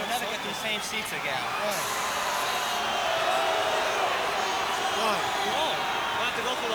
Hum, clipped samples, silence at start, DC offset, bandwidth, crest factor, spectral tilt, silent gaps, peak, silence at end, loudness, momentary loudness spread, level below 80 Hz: none; under 0.1%; 0 s; under 0.1%; over 20 kHz; 16 dB; -1.5 dB/octave; none; -12 dBFS; 0 s; -27 LUFS; 4 LU; -60 dBFS